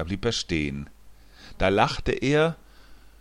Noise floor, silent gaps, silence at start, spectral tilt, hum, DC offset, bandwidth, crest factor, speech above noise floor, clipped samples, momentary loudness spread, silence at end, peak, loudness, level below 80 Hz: -49 dBFS; none; 0 s; -5 dB/octave; none; under 0.1%; 12.5 kHz; 20 dB; 24 dB; under 0.1%; 15 LU; 0.25 s; -6 dBFS; -25 LUFS; -40 dBFS